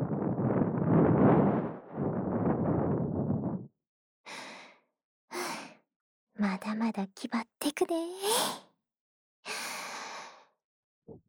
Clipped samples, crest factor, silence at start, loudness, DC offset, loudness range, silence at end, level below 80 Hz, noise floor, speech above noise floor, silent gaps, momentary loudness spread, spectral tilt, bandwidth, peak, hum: under 0.1%; 20 dB; 0 s; -31 LUFS; under 0.1%; 10 LU; 0.1 s; -62 dBFS; -56 dBFS; 23 dB; 3.89-4.24 s, 5.04-5.28 s, 5.96-6.27 s, 9.00-9.43 s, 10.64-11.02 s; 18 LU; -5.5 dB/octave; over 20 kHz; -12 dBFS; none